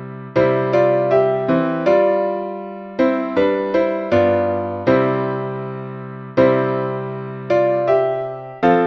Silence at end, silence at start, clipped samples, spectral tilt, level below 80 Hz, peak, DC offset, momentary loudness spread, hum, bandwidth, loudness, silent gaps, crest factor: 0 s; 0 s; under 0.1%; -8.5 dB/octave; -54 dBFS; -2 dBFS; under 0.1%; 12 LU; none; 6.4 kHz; -18 LUFS; none; 16 dB